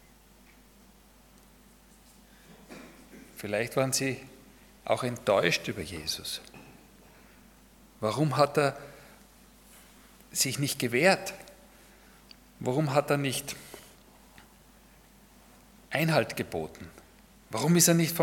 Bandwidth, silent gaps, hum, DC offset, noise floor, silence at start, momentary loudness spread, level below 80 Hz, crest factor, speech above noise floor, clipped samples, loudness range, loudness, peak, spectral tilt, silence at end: 18 kHz; none; none; under 0.1%; -57 dBFS; 2.5 s; 24 LU; -62 dBFS; 24 dB; 30 dB; under 0.1%; 6 LU; -28 LUFS; -8 dBFS; -4 dB/octave; 0 s